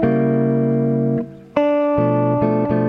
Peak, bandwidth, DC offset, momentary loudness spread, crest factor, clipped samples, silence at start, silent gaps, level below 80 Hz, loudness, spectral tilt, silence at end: -2 dBFS; 5 kHz; under 0.1%; 4 LU; 16 dB; under 0.1%; 0 s; none; -46 dBFS; -18 LUFS; -11 dB/octave; 0 s